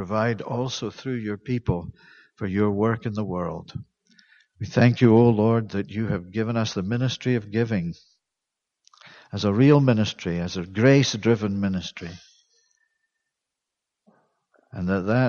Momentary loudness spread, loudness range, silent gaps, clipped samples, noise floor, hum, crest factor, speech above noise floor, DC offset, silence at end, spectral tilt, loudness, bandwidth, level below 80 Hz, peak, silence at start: 17 LU; 7 LU; none; under 0.1%; -85 dBFS; none; 20 dB; 62 dB; under 0.1%; 0 s; -7 dB/octave; -23 LUFS; 7.2 kHz; -54 dBFS; -4 dBFS; 0 s